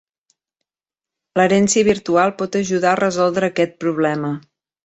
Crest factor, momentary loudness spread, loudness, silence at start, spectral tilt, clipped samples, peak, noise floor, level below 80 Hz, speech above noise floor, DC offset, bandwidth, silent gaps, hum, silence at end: 16 dB; 9 LU; -17 LUFS; 1.35 s; -4.5 dB/octave; under 0.1%; -2 dBFS; under -90 dBFS; -56 dBFS; over 73 dB; under 0.1%; 8.4 kHz; none; none; 0.45 s